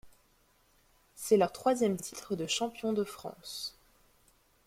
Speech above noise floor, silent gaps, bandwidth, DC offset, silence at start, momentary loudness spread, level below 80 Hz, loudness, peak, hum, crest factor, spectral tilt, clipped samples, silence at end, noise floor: 37 dB; none; 16.5 kHz; under 0.1%; 0.05 s; 14 LU; -68 dBFS; -32 LUFS; -14 dBFS; none; 20 dB; -4 dB/octave; under 0.1%; 0.95 s; -68 dBFS